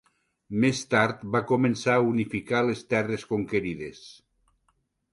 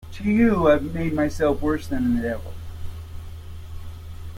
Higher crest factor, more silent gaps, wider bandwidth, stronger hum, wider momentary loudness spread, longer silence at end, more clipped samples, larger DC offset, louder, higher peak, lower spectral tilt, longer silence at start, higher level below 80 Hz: about the same, 18 dB vs 18 dB; neither; second, 11.5 kHz vs 16.5 kHz; neither; second, 8 LU vs 20 LU; first, 1 s vs 0 s; neither; neither; second, -26 LUFS vs -22 LUFS; about the same, -8 dBFS vs -6 dBFS; second, -6 dB/octave vs -7.5 dB/octave; first, 0.5 s vs 0 s; second, -60 dBFS vs -38 dBFS